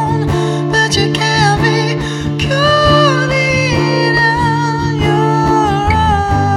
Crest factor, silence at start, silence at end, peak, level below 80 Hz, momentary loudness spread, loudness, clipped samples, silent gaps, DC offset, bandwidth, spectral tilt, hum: 12 dB; 0 s; 0 s; 0 dBFS; -28 dBFS; 5 LU; -12 LUFS; under 0.1%; none; under 0.1%; 12 kHz; -5 dB/octave; none